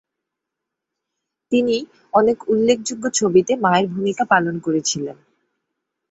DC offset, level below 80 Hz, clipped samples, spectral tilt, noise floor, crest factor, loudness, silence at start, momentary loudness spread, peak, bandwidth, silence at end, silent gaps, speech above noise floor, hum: under 0.1%; -62 dBFS; under 0.1%; -4 dB/octave; -82 dBFS; 18 dB; -19 LUFS; 1.5 s; 6 LU; -2 dBFS; 8.2 kHz; 0.95 s; none; 64 dB; none